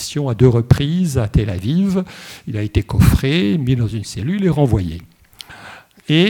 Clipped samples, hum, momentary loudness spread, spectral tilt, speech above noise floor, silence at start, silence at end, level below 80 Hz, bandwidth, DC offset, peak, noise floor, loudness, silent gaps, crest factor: under 0.1%; none; 19 LU; -6.5 dB/octave; 24 dB; 0 s; 0 s; -30 dBFS; 18.5 kHz; under 0.1%; 0 dBFS; -40 dBFS; -17 LUFS; none; 16 dB